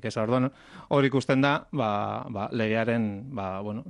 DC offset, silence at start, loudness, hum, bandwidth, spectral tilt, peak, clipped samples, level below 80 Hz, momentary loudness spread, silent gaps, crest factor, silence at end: under 0.1%; 0.05 s; -27 LUFS; none; 10.5 kHz; -7 dB/octave; -10 dBFS; under 0.1%; -64 dBFS; 9 LU; none; 16 dB; 0 s